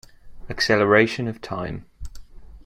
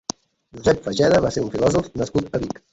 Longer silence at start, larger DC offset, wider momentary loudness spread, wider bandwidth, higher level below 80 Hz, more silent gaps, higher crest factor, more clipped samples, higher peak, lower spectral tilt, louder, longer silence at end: second, 0.25 s vs 0.55 s; neither; first, 22 LU vs 10 LU; first, 15 kHz vs 8.2 kHz; about the same, -44 dBFS vs -44 dBFS; neither; about the same, 22 dB vs 18 dB; neither; about the same, -2 dBFS vs -2 dBFS; about the same, -5 dB/octave vs -5.5 dB/octave; about the same, -21 LUFS vs -21 LUFS; second, 0.05 s vs 0.2 s